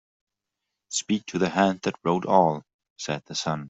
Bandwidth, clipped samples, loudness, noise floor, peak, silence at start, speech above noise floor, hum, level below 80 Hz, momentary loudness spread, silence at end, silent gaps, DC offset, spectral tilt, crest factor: 8.2 kHz; under 0.1%; -25 LUFS; -84 dBFS; -4 dBFS; 0.9 s; 60 dB; none; -66 dBFS; 11 LU; 0 s; 2.74-2.79 s, 2.90-2.96 s; under 0.1%; -4.5 dB/octave; 22 dB